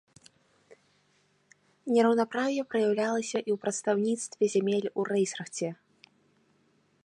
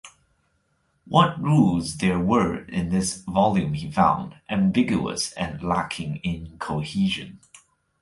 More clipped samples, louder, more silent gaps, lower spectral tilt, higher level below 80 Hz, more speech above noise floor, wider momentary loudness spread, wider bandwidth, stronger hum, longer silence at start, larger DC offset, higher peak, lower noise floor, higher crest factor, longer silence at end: neither; second, -29 LUFS vs -23 LUFS; neither; about the same, -4.5 dB/octave vs -5.5 dB/octave; second, -82 dBFS vs -48 dBFS; second, 41 dB vs 46 dB; about the same, 10 LU vs 10 LU; about the same, 11 kHz vs 11.5 kHz; neither; first, 0.7 s vs 0.05 s; neither; second, -12 dBFS vs -4 dBFS; about the same, -69 dBFS vs -69 dBFS; about the same, 18 dB vs 20 dB; first, 1.3 s vs 0.65 s